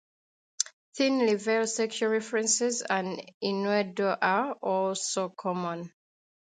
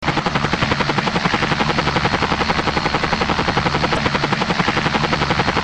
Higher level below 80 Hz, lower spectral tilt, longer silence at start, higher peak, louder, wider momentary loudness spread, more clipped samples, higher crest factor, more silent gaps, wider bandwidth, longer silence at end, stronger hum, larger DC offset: second, -80 dBFS vs -34 dBFS; second, -3 dB/octave vs -5 dB/octave; first, 0.6 s vs 0 s; second, -6 dBFS vs 0 dBFS; second, -28 LUFS vs -18 LUFS; first, 7 LU vs 1 LU; neither; first, 24 dB vs 18 dB; first, 0.73-0.92 s, 3.34-3.41 s vs none; about the same, 9.6 kHz vs 9.6 kHz; first, 0.6 s vs 0 s; neither; second, under 0.1% vs 0.1%